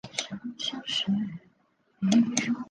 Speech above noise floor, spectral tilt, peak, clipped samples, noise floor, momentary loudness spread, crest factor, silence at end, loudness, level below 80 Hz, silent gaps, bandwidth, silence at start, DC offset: 41 dB; -3.5 dB/octave; -8 dBFS; under 0.1%; -68 dBFS; 14 LU; 22 dB; 0.05 s; -28 LUFS; -68 dBFS; none; 10 kHz; 0.05 s; under 0.1%